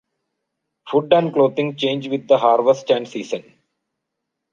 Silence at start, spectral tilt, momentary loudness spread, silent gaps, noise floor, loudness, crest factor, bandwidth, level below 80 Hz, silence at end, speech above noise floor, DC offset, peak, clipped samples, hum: 0.85 s; -6 dB/octave; 12 LU; none; -79 dBFS; -18 LUFS; 18 dB; 7.4 kHz; -68 dBFS; 1.1 s; 62 dB; under 0.1%; -2 dBFS; under 0.1%; none